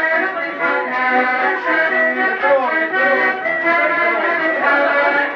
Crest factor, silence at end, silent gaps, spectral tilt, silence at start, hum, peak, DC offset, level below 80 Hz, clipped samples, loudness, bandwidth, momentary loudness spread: 12 dB; 0 s; none; -4.5 dB/octave; 0 s; none; -4 dBFS; under 0.1%; -68 dBFS; under 0.1%; -15 LUFS; 7 kHz; 3 LU